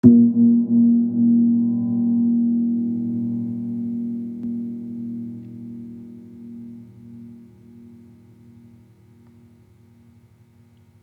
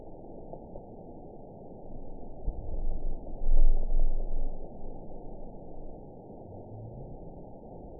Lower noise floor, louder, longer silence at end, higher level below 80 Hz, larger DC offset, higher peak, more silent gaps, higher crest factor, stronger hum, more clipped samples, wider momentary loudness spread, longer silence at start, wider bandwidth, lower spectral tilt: first, -53 dBFS vs -46 dBFS; first, -20 LUFS vs -40 LUFS; first, 3.7 s vs 0 s; second, -70 dBFS vs -30 dBFS; second, under 0.1% vs 0.1%; first, -2 dBFS vs -10 dBFS; neither; about the same, 20 dB vs 18 dB; neither; neither; first, 24 LU vs 14 LU; about the same, 0.05 s vs 0 s; about the same, 1.1 kHz vs 1 kHz; second, -12.5 dB/octave vs -15 dB/octave